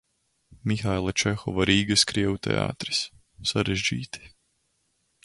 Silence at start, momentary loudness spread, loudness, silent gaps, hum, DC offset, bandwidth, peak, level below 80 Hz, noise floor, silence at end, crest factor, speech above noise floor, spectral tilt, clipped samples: 0.5 s; 13 LU; -25 LUFS; none; none; under 0.1%; 11.5 kHz; -6 dBFS; -48 dBFS; -72 dBFS; 0.95 s; 22 dB; 47 dB; -4 dB/octave; under 0.1%